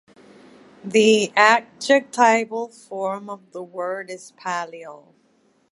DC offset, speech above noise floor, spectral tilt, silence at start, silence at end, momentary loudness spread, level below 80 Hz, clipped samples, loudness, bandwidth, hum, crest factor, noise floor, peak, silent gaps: under 0.1%; 41 dB; -3 dB/octave; 0.85 s; 0.75 s; 20 LU; -76 dBFS; under 0.1%; -19 LUFS; 11.5 kHz; none; 22 dB; -62 dBFS; 0 dBFS; none